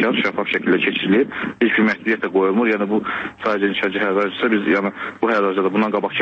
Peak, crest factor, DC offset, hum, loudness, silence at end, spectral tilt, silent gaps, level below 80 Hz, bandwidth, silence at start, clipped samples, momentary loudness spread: -6 dBFS; 14 dB; under 0.1%; none; -19 LUFS; 0 s; -7 dB/octave; none; -62 dBFS; 7.2 kHz; 0 s; under 0.1%; 5 LU